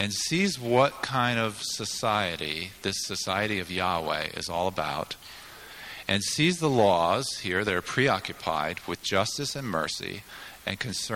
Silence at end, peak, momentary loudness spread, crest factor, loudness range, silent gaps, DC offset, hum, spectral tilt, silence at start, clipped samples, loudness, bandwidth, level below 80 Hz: 0 s; -8 dBFS; 12 LU; 20 dB; 4 LU; none; under 0.1%; none; -3.5 dB/octave; 0 s; under 0.1%; -27 LUFS; 17.5 kHz; -58 dBFS